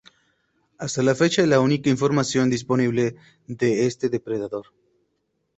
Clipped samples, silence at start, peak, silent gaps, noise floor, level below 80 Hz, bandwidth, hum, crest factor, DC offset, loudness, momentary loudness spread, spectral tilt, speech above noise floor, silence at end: under 0.1%; 0.8 s; -6 dBFS; none; -73 dBFS; -60 dBFS; 8.4 kHz; none; 18 dB; under 0.1%; -22 LUFS; 11 LU; -5.5 dB/octave; 52 dB; 0.95 s